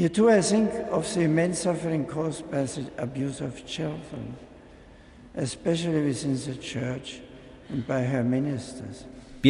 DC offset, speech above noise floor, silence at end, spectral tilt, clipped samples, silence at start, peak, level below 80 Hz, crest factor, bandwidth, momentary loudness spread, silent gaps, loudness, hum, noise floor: under 0.1%; 23 dB; 0 s; -5.5 dB/octave; under 0.1%; 0 s; -6 dBFS; -54 dBFS; 20 dB; 11 kHz; 17 LU; none; -27 LUFS; none; -49 dBFS